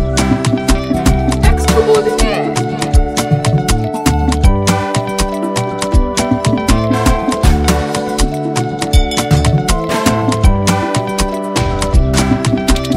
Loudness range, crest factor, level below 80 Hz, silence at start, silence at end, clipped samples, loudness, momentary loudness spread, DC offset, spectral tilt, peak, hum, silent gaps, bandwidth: 1 LU; 12 dB; -18 dBFS; 0 s; 0 s; under 0.1%; -14 LUFS; 5 LU; under 0.1%; -5.5 dB/octave; 0 dBFS; none; none; 16.5 kHz